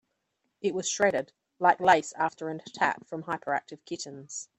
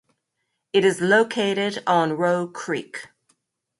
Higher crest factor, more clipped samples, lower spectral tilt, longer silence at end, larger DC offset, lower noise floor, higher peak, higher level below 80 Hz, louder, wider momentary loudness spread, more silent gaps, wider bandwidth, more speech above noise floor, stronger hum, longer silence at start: first, 24 dB vs 18 dB; neither; second, -3 dB/octave vs -4.5 dB/octave; second, 0.15 s vs 0.75 s; neither; about the same, -79 dBFS vs -77 dBFS; about the same, -6 dBFS vs -6 dBFS; about the same, -72 dBFS vs -70 dBFS; second, -28 LUFS vs -21 LUFS; first, 15 LU vs 10 LU; neither; about the same, 11.5 kHz vs 11.5 kHz; second, 51 dB vs 56 dB; neither; about the same, 0.65 s vs 0.75 s